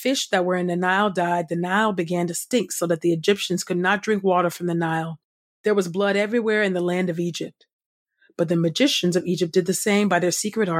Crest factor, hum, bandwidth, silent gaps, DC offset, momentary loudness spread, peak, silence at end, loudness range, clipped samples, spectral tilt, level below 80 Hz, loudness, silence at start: 18 dB; none; 16 kHz; 5.24-5.64 s, 7.73-7.79 s, 7.86-8.06 s; under 0.1%; 6 LU; -4 dBFS; 0 s; 2 LU; under 0.1%; -4.5 dB/octave; -72 dBFS; -22 LUFS; 0 s